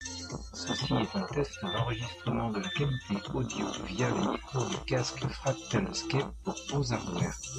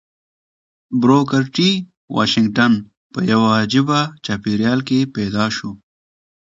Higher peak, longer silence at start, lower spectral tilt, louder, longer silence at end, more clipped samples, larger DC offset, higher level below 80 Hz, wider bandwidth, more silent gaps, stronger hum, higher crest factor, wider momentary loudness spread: second, -16 dBFS vs 0 dBFS; second, 0 s vs 0.9 s; about the same, -5 dB/octave vs -5.5 dB/octave; second, -33 LUFS vs -17 LUFS; second, 0 s vs 0.7 s; neither; neither; about the same, -50 dBFS vs -52 dBFS; first, 10 kHz vs 7.8 kHz; second, none vs 1.97-2.08 s, 2.97-3.10 s; neither; about the same, 16 dB vs 18 dB; second, 4 LU vs 9 LU